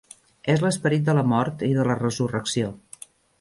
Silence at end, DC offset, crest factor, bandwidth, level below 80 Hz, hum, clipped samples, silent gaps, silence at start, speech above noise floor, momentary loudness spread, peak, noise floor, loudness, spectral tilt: 0.65 s; under 0.1%; 16 dB; 11.5 kHz; -58 dBFS; none; under 0.1%; none; 0.45 s; 25 dB; 13 LU; -8 dBFS; -47 dBFS; -23 LUFS; -6 dB/octave